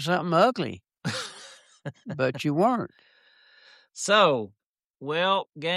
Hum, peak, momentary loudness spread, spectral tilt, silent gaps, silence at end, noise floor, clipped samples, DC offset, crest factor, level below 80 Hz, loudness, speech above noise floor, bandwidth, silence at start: none; -8 dBFS; 21 LU; -4.5 dB/octave; 4.66-4.75 s, 4.90-4.94 s, 5.49-5.53 s; 0 s; -59 dBFS; under 0.1%; under 0.1%; 20 dB; -74 dBFS; -25 LUFS; 34 dB; 13 kHz; 0 s